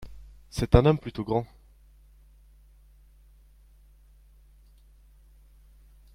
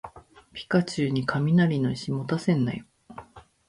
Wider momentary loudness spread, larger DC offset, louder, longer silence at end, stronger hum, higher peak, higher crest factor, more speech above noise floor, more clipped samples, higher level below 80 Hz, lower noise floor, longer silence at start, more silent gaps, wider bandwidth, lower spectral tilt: about the same, 23 LU vs 23 LU; neither; about the same, -25 LUFS vs -25 LUFS; first, 4.7 s vs 0.3 s; neither; first, -2 dBFS vs -10 dBFS; first, 28 dB vs 16 dB; first, 33 dB vs 26 dB; neither; first, -40 dBFS vs -58 dBFS; first, -56 dBFS vs -50 dBFS; about the same, 0 s vs 0.05 s; neither; first, 15.5 kHz vs 11 kHz; about the same, -7.5 dB/octave vs -7 dB/octave